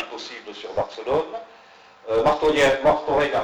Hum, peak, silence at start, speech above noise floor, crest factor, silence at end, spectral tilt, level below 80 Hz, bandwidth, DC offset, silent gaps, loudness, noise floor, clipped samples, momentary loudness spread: none; -8 dBFS; 0 s; 28 dB; 14 dB; 0 s; -4.5 dB/octave; -48 dBFS; 19.5 kHz; under 0.1%; none; -21 LUFS; -49 dBFS; under 0.1%; 17 LU